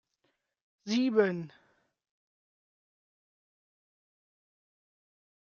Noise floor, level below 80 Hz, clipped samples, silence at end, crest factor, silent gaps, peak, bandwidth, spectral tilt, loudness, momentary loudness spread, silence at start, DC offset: -79 dBFS; -86 dBFS; under 0.1%; 3.95 s; 24 dB; none; -14 dBFS; 7.2 kHz; -4.5 dB/octave; -29 LUFS; 21 LU; 0.85 s; under 0.1%